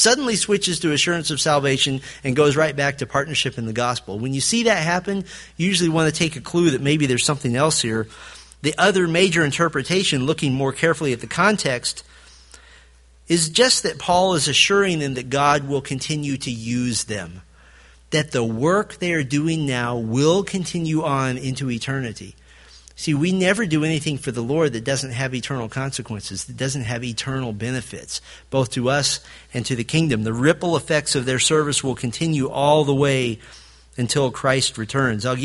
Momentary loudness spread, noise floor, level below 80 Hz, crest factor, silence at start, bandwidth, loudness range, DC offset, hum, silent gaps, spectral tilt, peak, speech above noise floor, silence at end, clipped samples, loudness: 10 LU; -50 dBFS; -50 dBFS; 20 dB; 0 s; 11.5 kHz; 5 LU; under 0.1%; none; none; -4 dB/octave; 0 dBFS; 30 dB; 0 s; under 0.1%; -20 LUFS